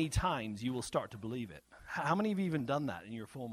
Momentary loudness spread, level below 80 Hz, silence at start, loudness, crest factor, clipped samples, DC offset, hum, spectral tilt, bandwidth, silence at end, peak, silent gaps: 11 LU; -52 dBFS; 0 s; -37 LUFS; 20 dB; under 0.1%; under 0.1%; none; -5.5 dB/octave; 15.5 kHz; 0 s; -18 dBFS; none